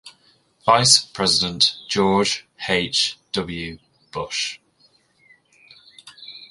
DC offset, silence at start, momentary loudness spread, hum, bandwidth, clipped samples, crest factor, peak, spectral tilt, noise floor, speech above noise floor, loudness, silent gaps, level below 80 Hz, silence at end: under 0.1%; 0.05 s; 20 LU; none; 11.5 kHz; under 0.1%; 22 dB; 0 dBFS; -2.5 dB/octave; -60 dBFS; 40 dB; -19 LUFS; none; -52 dBFS; 0.05 s